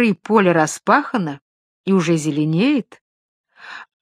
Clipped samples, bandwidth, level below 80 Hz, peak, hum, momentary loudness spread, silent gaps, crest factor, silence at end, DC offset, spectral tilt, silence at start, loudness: under 0.1%; 14 kHz; -68 dBFS; 0 dBFS; none; 21 LU; 1.41-1.84 s, 3.01-3.44 s; 18 dB; 0.2 s; under 0.1%; -6 dB/octave; 0 s; -18 LUFS